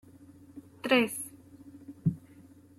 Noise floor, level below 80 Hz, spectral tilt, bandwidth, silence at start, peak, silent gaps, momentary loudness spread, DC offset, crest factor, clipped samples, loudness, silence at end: -55 dBFS; -68 dBFS; -5 dB/octave; 16 kHz; 0.55 s; -12 dBFS; none; 26 LU; under 0.1%; 22 dB; under 0.1%; -30 LUFS; 0.4 s